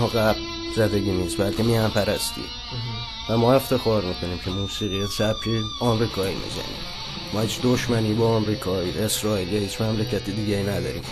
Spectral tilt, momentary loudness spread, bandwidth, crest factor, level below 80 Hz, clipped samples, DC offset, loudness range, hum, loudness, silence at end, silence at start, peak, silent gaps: -5 dB/octave; 9 LU; 13 kHz; 18 dB; -42 dBFS; under 0.1%; under 0.1%; 2 LU; none; -24 LUFS; 0 s; 0 s; -6 dBFS; none